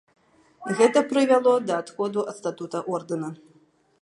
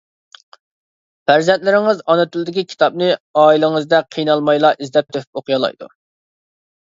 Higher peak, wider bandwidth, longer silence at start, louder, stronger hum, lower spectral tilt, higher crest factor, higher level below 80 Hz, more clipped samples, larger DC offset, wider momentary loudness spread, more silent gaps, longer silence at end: second, -4 dBFS vs 0 dBFS; first, 11 kHz vs 7.6 kHz; second, 0.6 s vs 1.3 s; second, -24 LUFS vs -15 LUFS; neither; about the same, -5 dB/octave vs -5.5 dB/octave; about the same, 20 dB vs 16 dB; second, -78 dBFS vs -66 dBFS; neither; neither; first, 13 LU vs 9 LU; second, none vs 3.20-3.34 s, 5.27-5.33 s; second, 0.65 s vs 1.05 s